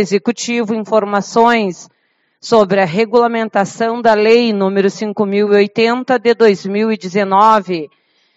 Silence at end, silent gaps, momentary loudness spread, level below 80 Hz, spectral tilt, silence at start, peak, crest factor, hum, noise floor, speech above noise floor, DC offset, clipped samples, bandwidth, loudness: 0.5 s; none; 7 LU; -62 dBFS; -5 dB/octave; 0 s; 0 dBFS; 14 dB; none; -62 dBFS; 49 dB; under 0.1%; under 0.1%; 8 kHz; -13 LUFS